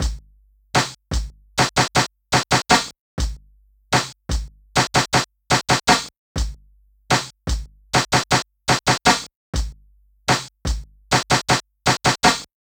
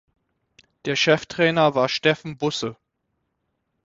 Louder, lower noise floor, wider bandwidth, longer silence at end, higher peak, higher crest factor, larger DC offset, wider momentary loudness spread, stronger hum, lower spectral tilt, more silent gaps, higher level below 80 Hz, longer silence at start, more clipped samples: about the same, -20 LUFS vs -21 LUFS; second, -55 dBFS vs -75 dBFS; first, over 20 kHz vs 8 kHz; second, 0.25 s vs 1.15 s; first, 0 dBFS vs -4 dBFS; about the same, 22 dB vs 20 dB; neither; about the same, 12 LU vs 10 LU; first, 50 Hz at -50 dBFS vs none; second, -3 dB/octave vs -4.5 dB/octave; first, 2.99-3.17 s, 6.17-6.35 s, 9.35-9.53 s vs none; first, -32 dBFS vs -62 dBFS; second, 0 s vs 0.85 s; neither